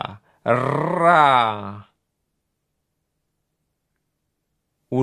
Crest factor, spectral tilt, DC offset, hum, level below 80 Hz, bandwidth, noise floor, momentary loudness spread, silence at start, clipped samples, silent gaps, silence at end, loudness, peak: 22 dB; -6.5 dB/octave; under 0.1%; none; -64 dBFS; 10.5 kHz; -76 dBFS; 18 LU; 0 s; under 0.1%; none; 0 s; -18 LUFS; 0 dBFS